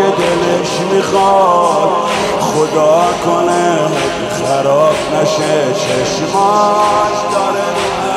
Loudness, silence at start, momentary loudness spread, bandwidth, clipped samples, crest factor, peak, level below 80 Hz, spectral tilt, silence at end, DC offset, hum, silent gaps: -12 LUFS; 0 s; 4 LU; 15 kHz; under 0.1%; 12 dB; 0 dBFS; -44 dBFS; -4 dB/octave; 0 s; under 0.1%; none; none